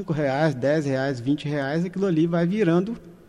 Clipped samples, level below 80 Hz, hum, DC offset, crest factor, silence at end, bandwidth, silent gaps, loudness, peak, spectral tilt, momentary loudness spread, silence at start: under 0.1%; -58 dBFS; none; under 0.1%; 14 dB; 0.15 s; 10.5 kHz; none; -23 LUFS; -10 dBFS; -7.5 dB/octave; 4 LU; 0 s